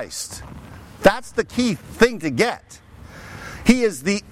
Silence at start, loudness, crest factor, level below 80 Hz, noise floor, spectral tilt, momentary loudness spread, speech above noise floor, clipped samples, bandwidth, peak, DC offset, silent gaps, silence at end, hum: 0 s; -20 LUFS; 20 dB; -42 dBFS; -40 dBFS; -4.5 dB/octave; 21 LU; 20 dB; under 0.1%; 16 kHz; -2 dBFS; under 0.1%; none; 0.1 s; none